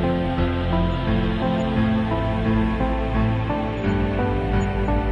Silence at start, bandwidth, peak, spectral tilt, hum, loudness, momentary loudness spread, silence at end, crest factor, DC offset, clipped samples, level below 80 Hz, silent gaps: 0 s; 9 kHz; -8 dBFS; -8.5 dB/octave; none; -22 LUFS; 2 LU; 0 s; 12 dB; under 0.1%; under 0.1%; -28 dBFS; none